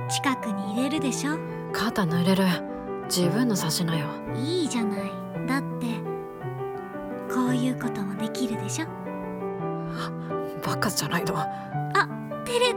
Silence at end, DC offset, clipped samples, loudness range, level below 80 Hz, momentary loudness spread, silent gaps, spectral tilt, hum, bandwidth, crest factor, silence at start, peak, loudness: 0 s; under 0.1%; under 0.1%; 4 LU; -58 dBFS; 10 LU; none; -5 dB/octave; none; 17.5 kHz; 18 dB; 0 s; -10 dBFS; -27 LUFS